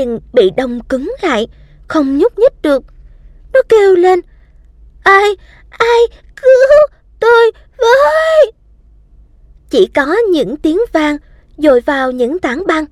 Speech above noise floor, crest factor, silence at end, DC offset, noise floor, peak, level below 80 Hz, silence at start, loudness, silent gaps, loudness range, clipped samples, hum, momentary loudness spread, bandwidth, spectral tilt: 33 dB; 12 dB; 0.05 s; under 0.1%; -44 dBFS; 0 dBFS; -40 dBFS; 0 s; -11 LUFS; none; 4 LU; under 0.1%; none; 9 LU; 13 kHz; -4.5 dB/octave